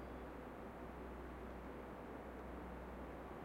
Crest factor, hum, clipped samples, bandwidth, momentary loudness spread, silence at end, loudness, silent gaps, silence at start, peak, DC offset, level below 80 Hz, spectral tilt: 12 dB; none; under 0.1%; 16 kHz; 1 LU; 0 s; -52 LUFS; none; 0 s; -38 dBFS; under 0.1%; -58 dBFS; -7 dB/octave